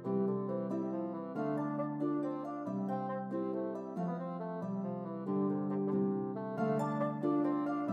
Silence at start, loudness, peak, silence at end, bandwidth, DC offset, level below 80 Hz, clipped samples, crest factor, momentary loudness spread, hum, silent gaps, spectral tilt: 0 s; -36 LUFS; -22 dBFS; 0 s; 7.6 kHz; under 0.1%; -88 dBFS; under 0.1%; 14 dB; 6 LU; none; none; -10 dB/octave